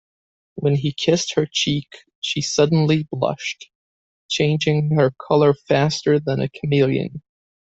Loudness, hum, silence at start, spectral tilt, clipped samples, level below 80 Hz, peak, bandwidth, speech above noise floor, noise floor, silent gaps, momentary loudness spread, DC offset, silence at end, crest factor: -20 LUFS; none; 0.55 s; -5.5 dB/octave; under 0.1%; -56 dBFS; -2 dBFS; 8 kHz; over 71 dB; under -90 dBFS; 2.15-2.22 s, 3.75-4.29 s; 10 LU; under 0.1%; 0.55 s; 18 dB